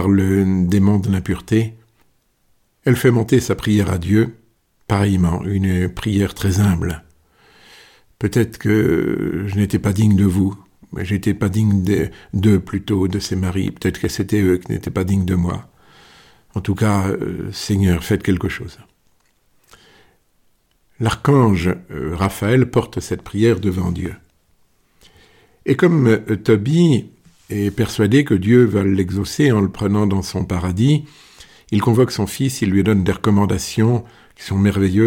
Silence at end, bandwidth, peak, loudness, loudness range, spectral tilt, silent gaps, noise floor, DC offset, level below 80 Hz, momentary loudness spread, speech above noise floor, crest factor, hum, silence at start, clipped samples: 0 s; 17 kHz; 0 dBFS; -18 LUFS; 5 LU; -7 dB/octave; none; -61 dBFS; under 0.1%; -40 dBFS; 9 LU; 44 dB; 16 dB; none; 0 s; under 0.1%